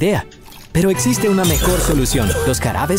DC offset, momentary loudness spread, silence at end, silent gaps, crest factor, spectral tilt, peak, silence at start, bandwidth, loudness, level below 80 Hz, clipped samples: under 0.1%; 6 LU; 0 s; none; 12 dB; -4.5 dB/octave; -4 dBFS; 0 s; 16.5 kHz; -16 LUFS; -26 dBFS; under 0.1%